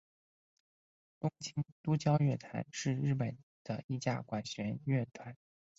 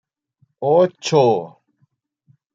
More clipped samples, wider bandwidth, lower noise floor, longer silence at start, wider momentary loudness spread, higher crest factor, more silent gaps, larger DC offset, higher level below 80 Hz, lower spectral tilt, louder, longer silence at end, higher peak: neither; about the same, 7.8 kHz vs 7.8 kHz; first, under -90 dBFS vs -65 dBFS; first, 1.25 s vs 0.6 s; about the same, 12 LU vs 10 LU; about the same, 20 dB vs 18 dB; first, 1.72-1.84 s, 3.43-3.65 s, 3.84-3.89 s vs none; neither; about the same, -70 dBFS vs -70 dBFS; about the same, -6.5 dB/octave vs -6 dB/octave; second, -37 LUFS vs -17 LUFS; second, 0.45 s vs 1.05 s; second, -16 dBFS vs -2 dBFS